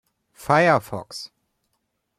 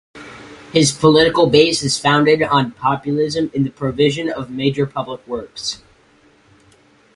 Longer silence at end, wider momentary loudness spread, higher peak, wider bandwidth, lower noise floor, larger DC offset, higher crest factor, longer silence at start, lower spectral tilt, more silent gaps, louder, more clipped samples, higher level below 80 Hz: second, 0.95 s vs 1.4 s; first, 20 LU vs 15 LU; second, -4 dBFS vs 0 dBFS; first, 15.5 kHz vs 11.5 kHz; first, -75 dBFS vs -52 dBFS; neither; about the same, 20 dB vs 18 dB; first, 0.4 s vs 0.15 s; about the same, -5.5 dB/octave vs -4.5 dB/octave; neither; second, -19 LUFS vs -16 LUFS; neither; second, -62 dBFS vs -50 dBFS